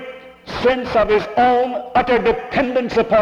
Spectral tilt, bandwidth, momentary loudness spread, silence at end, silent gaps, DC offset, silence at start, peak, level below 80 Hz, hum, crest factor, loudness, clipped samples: -6 dB/octave; 7.8 kHz; 6 LU; 0 s; none; under 0.1%; 0 s; -6 dBFS; -42 dBFS; none; 12 dB; -17 LUFS; under 0.1%